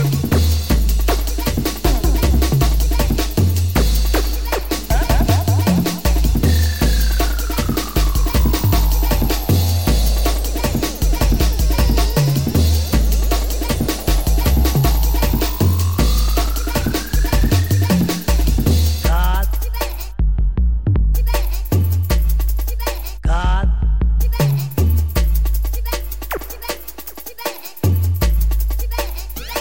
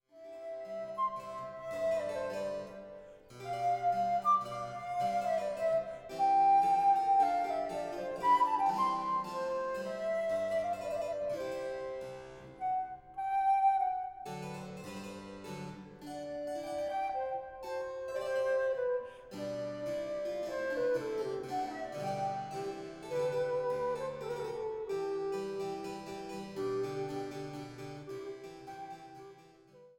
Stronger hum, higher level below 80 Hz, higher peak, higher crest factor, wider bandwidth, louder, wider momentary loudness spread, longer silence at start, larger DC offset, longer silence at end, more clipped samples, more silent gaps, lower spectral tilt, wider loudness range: neither; first, -18 dBFS vs -68 dBFS; first, -2 dBFS vs -18 dBFS; about the same, 14 dB vs 16 dB; about the same, 17 kHz vs 17 kHz; first, -18 LUFS vs -35 LUFS; second, 7 LU vs 17 LU; second, 0 s vs 0.15 s; first, 2% vs under 0.1%; about the same, 0 s vs 0.05 s; neither; neither; about the same, -5.5 dB/octave vs -5.5 dB/octave; second, 3 LU vs 10 LU